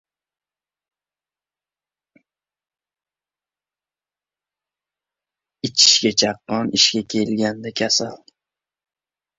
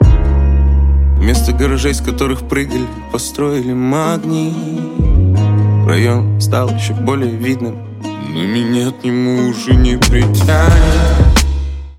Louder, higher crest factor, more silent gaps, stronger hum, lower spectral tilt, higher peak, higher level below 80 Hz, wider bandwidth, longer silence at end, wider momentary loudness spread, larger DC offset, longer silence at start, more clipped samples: second, -17 LUFS vs -14 LUFS; first, 24 dB vs 12 dB; neither; first, 50 Hz at -65 dBFS vs none; second, -2 dB/octave vs -6 dB/octave; about the same, -2 dBFS vs 0 dBFS; second, -64 dBFS vs -16 dBFS; second, 8 kHz vs 16 kHz; first, 1.2 s vs 0.05 s; first, 12 LU vs 9 LU; neither; first, 5.65 s vs 0 s; neither